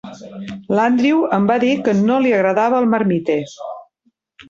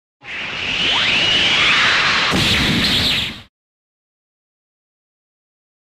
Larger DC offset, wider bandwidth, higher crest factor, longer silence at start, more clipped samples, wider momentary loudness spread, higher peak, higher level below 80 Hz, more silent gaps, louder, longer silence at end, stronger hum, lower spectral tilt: neither; second, 7.6 kHz vs 16 kHz; about the same, 14 dB vs 14 dB; second, 0.05 s vs 0.25 s; neither; first, 17 LU vs 12 LU; about the same, -4 dBFS vs -6 dBFS; second, -60 dBFS vs -40 dBFS; neither; about the same, -16 LUFS vs -14 LUFS; second, 0.05 s vs 2.55 s; neither; first, -7 dB/octave vs -2.5 dB/octave